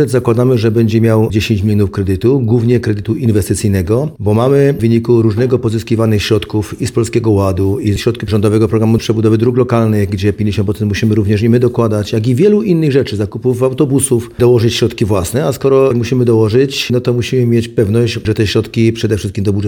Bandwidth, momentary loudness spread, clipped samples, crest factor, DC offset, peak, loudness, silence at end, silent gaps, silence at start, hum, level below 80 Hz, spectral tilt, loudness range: 17 kHz; 5 LU; under 0.1%; 12 dB; under 0.1%; 0 dBFS; -12 LUFS; 0 s; none; 0 s; none; -38 dBFS; -6.5 dB/octave; 1 LU